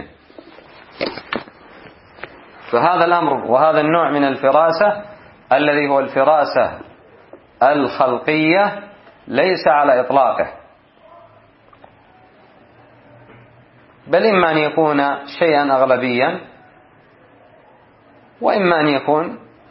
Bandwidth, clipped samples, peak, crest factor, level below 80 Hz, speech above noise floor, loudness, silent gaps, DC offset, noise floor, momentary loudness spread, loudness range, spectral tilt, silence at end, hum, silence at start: 5.8 kHz; under 0.1%; 0 dBFS; 18 dB; -60 dBFS; 34 dB; -16 LUFS; none; under 0.1%; -49 dBFS; 13 LU; 5 LU; -10 dB/octave; 0.3 s; none; 0 s